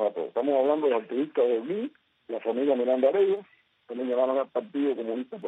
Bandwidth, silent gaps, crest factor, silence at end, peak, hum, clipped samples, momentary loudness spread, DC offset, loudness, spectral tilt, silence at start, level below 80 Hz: 4 kHz; none; 16 dB; 0 s; -12 dBFS; none; under 0.1%; 10 LU; under 0.1%; -27 LUFS; -7.5 dB/octave; 0 s; -80 dBFS